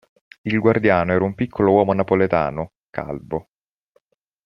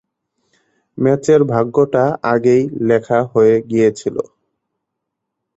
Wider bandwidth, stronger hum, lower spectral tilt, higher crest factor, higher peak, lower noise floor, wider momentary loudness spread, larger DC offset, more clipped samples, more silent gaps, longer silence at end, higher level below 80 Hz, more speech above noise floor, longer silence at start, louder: second, 6 kHz vs 8 kHz; neither; first, -9.5 dB/octave vs -7.5 dB/octave; about the same, 18 dB vs 14 dB; about the same, -2 dBFS vs -2 dBFS; second, -65 dBFS vs -78 dBFS; first, 14 LU vs 8 LU; neither; neither; first, 2.77-2.93 s vs none; second, 1.05 s vs 1.35 s; about the same, -52 dBFS vs -56 dBFS; second, 46 dB vs 64 dB; second, 0.45 s vs 0.95 s; second, -19 LUFS vs -15 LUFS